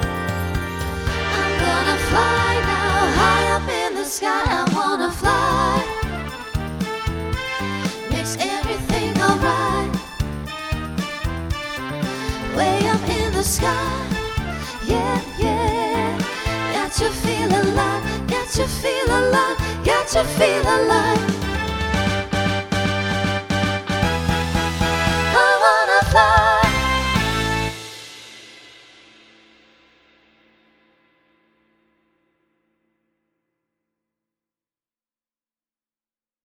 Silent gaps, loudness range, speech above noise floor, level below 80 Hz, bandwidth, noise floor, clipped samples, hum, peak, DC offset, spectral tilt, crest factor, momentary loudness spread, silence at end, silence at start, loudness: none; 7 LU; over 71 dB; -32 dBFS; 19.5 kHz; under -90 dBFS; under 0.1%; none; 0 dBFS; under 0.1%; -4.5 dB/octave; 20 dB; 10 LU; 7.85 s; 0 s; -20 LUFS